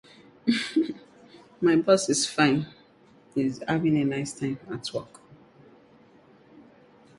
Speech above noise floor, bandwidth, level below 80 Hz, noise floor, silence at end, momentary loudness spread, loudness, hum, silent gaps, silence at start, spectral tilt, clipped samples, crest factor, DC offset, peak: 32 dB; 11.5 kHz; -64 dBFS; -57 dBFS; 0.6 s; 12 LU; -26 LUFS; none; none; 0.45 s; -4.5 dB/octave; under 0.1%; 22 dB; under 0.1%; -6 dBFS